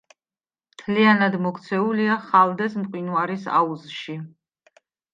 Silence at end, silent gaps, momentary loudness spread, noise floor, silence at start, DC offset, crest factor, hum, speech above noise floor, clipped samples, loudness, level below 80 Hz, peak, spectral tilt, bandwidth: 0.85 s; none; 16 LU; under -90 dBFS; 0.8 s; under 0.1%; 20 dB; none; over 69 dB; under 0.1%; -21 LUFS; -72 dBFS; -4 dBFS; -7 dB/octave; 7.6 kHz